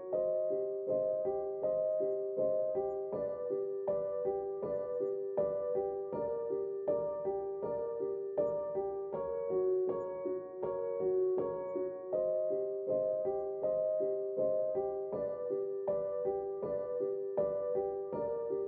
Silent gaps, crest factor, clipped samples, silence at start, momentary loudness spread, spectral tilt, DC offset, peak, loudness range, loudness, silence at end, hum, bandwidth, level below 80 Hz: none; 14 dB; under 0.1%; 0 s; 5 LU; -10 dB/octave; under 0.1%; -20 dBFS; 2 LU; -36 LUFS; 0 s; none; 2.5 kHz; -72 dBFS